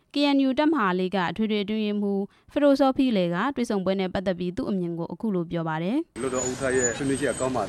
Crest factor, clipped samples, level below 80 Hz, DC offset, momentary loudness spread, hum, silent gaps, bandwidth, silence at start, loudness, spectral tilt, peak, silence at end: 16 dB; under 0.1%; -54 dBFS; under 0.1%; 7 LU; none; none; 12 kHz; 0.15 s; -25 LUFS; -5 dB/octave; -8 dBFS; 0 s